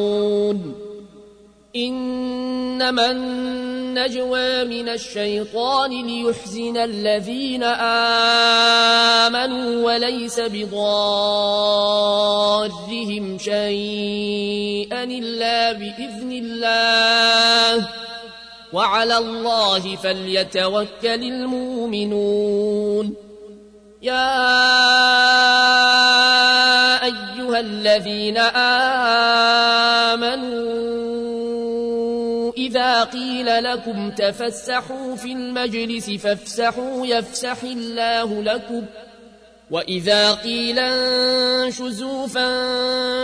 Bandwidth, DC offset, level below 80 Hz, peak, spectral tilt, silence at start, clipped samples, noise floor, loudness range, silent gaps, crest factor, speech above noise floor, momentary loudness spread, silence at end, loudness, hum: 11 kHz; under 0.1%; -56 dBFS; -6 dBFS; -2.5 dB/octave; 0 s; under 0.1%; -48 dBFS; 9 LU; none; 14 dB; 29 dB; 14 LU; 0 s; -18 LUFS; none